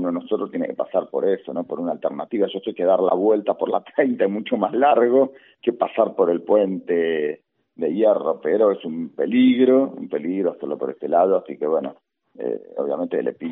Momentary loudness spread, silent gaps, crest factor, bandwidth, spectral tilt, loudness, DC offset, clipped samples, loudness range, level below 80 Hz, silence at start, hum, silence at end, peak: 11 LU; none; 16 dB; 3.9 kHz; -5 dB/octave; -21 LUFS; under 0.1%; under 0.1%; 3 LU; -76 dBFS; 0 s; none; 0 s; -4 dBFS